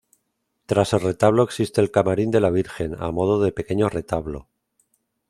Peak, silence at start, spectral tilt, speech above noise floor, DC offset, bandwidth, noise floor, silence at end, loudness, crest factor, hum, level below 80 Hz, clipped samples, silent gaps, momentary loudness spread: -2 dBFS; 0.7 s; -6.5 dB/octave; 54 dB; under 0.1%; 14 kHz; -74 dBFS; 0.9 s; -21 LUFS; 20 dB; none; -48 dBFS; under 0.1%; none; 9 LU